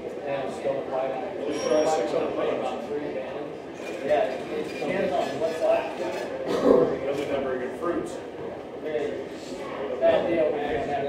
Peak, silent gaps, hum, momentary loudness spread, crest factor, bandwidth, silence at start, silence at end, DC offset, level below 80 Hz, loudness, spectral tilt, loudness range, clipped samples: -4 dBFS; none; none; 12 LU; 22 dB; 15 kHz; 0 s; 0 s; under 0.1%; -60 dBFS; -27 LUFS; -5.5 dB/octave; 3 LU; under 0.1%